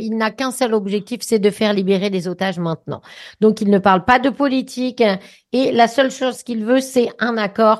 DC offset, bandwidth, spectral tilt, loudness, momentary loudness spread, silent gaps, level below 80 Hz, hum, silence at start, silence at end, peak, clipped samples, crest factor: under 0.1%; 12.5 kHz; -5 dB/octave; -18 LUFS; 10 LU; none; -54 dBFS; none; 0 s; 0 s; 0 dBFS; under 0.1%; 16 dB